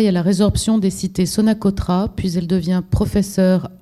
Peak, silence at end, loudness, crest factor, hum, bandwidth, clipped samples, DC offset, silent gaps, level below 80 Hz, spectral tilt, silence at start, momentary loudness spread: -4 dBFS; 0.05 s; -18 LUFS; 12 dB; none; 13 kHz; under 0.1%; under 0.1%; none; -34 dBFS; -6.5 dB/octave; 0 s; 4 LU